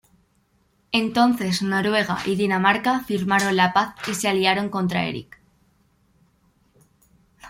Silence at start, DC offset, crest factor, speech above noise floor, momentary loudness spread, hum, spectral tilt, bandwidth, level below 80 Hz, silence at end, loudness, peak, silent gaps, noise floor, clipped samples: 0.9 s; under 0.1%; 20 dB; 43 dB; 6 LU; none; -4.5 dB/octave; 16.5 kHz; -60 dBFS; 0 s; -21 LUFS; -4 dBFS; none; -64 dBFS; under 0.1%